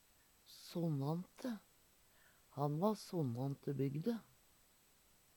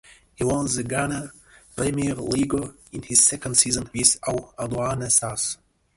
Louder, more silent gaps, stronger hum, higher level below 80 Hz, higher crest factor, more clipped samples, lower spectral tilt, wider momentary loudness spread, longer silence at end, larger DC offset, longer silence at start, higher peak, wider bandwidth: second, -42 LUFS vs -22 LUFS; neither; neither; second, -78 dBFS vs -48 dBFS; about the same, 20 dB vs 22 dB; neither; first, -7.5 dB/octave vs -3 dB/octave; second, 12 LU vs 15 LU; first, 1.15 s vs 0.4 s; neither; about the same, 0.5 s vs 0.4 s; second, -22 dBFS vs -2 dBFS; first, 19 kHz vs 12 kHz